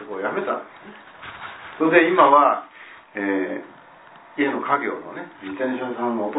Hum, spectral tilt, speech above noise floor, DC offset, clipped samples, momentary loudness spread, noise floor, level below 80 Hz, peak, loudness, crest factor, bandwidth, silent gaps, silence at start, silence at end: none; -9 dB/octave; 26 dB; under 0.1%; under 0.1%; 25 LU; -47 dBFS; -70 dBFS; -2 dBFS; -20 LUFS; 20 dB; 4 kHz; none; 0 s; 0 s